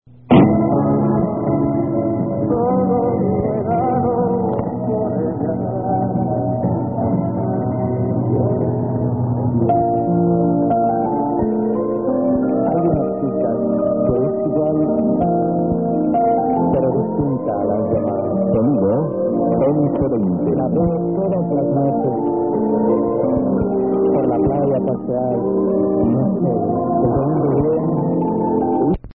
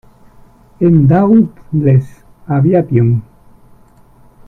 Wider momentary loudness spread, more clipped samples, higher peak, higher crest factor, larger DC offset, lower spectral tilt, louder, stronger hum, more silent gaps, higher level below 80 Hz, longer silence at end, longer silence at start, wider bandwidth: second, 4 LU vs 9 LU; neither; about the same, 0 dBFS vs 0 dBFS; about the same, 16 dB vs 12 dB; first, 0.3% vs under 0.1%; first, -14.5 dB/octave vs -12 dB/octave; second, -18 LUFS vs -12 LUFS; neither; neither; about the same, -40 dBFS vs -42 dBFS; second, 0 s vs 1.25 s; second, 0.25 s vs 0.8 s; first, 3.7 kHz vs 2.9 kHz